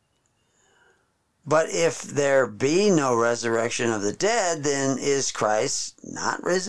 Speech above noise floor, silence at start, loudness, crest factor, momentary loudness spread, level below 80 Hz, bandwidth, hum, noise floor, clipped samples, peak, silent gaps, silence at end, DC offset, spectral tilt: 46 dB; 0 s; -23 LUFS; 16 dB; 6 LU; -64 dBFS; 11 kHz; none; -69 dBFS; under 0.1%; -8 dBFS; none; 0 s; 0.5%; -3.5 dB/octave